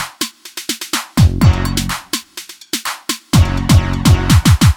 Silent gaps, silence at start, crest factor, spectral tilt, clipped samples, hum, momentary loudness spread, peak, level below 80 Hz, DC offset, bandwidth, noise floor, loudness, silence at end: none; 0 s; 14 dB; -5 dB/octave; under 0.1%; none; 12 LU; 0 dBFS; -22 dBFS; under 0.1%; 19 kHz; -34 dBFS; -15 LUFS; 0 s